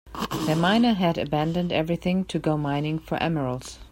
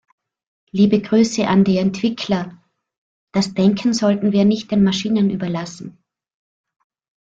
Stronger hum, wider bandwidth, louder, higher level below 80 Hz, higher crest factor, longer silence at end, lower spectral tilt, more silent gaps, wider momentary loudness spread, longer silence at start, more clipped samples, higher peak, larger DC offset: neither; first, 16.5 kHz vs 8 kHz; second, -25 LUFS vs -18 LUFS; first, -48 dBFS vs -54 dBFS; about the same, 16 dB vs 16 dB; second, 0.05 s vs 1.35 s; about the same, -6.5 dB/octave vs -6 dB/octave; second, none vs 2.98-3.27 s; second, 8 LU vs 11 LU; second, 0.05 s vs 0.75 s; neither; second, -8 dBFS vs -4 dBFS; neither